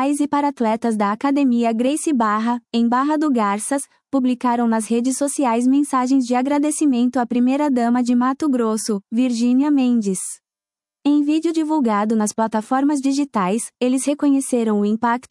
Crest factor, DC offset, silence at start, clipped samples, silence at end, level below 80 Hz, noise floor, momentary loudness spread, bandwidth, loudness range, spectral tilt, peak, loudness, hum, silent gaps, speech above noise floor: 12 dB; under 0.1%; 0 s; under 0.1%; 0.1 s; -70 dBFS; under -90 dBFS; 4 LU; 12 kHz; 2 LU; -5 dB/octave; -6 dBFS; -19 LUFS; none; none; over 72 dB